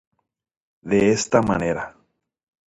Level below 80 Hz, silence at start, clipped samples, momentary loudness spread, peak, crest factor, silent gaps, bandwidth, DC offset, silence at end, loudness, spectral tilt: -50 dBFS; 0.85 s; under 0.1%; 10 LU; -4 dBFS; 20 dB; none; 10.5 kHz; under 0.1%; 0.8 s; -20 LUFS; -5 dB/octave